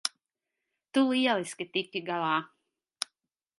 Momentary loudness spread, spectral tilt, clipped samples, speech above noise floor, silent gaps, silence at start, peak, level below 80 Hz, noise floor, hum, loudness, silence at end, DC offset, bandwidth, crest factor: 13 LU; -3.5 dB/octave; under 0.1%; 58 dB; none; 0.05 s; -10 dBFS; -86 dBFS; -87 dBFS; none; -30 LUFS; 0.55 s; under 0.1%; 11.5 kHz; 22 dB